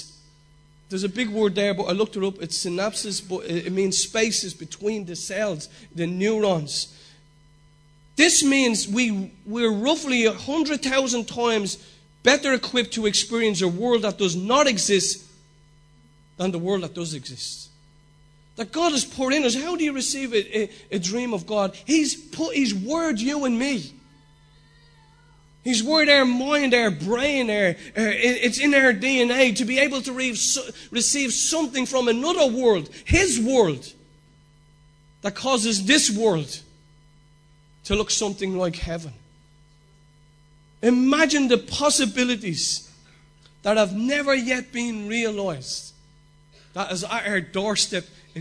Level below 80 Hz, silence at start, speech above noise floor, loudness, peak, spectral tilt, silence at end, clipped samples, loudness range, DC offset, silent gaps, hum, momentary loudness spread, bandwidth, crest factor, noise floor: -48 dBFS; 0 s; 33 dB; -22 LUFS; -2 dBFS; -3 dB/octave; 0 s; under 0.1%; 7 LU; under 0.1%; none; none; 12 LU; 11 kHz; 22 dB; -55 dBFS